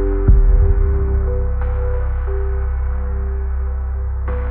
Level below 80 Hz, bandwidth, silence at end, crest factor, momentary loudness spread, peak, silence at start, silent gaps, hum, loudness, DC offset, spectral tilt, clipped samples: -16 dBFS; 2.6 kHz; 0 s; 14 dB; 8 LU; -2 dBFS; 0 s; none; none; -20 LUFS; under 0.1%; -11 dB/octave; under 0.1%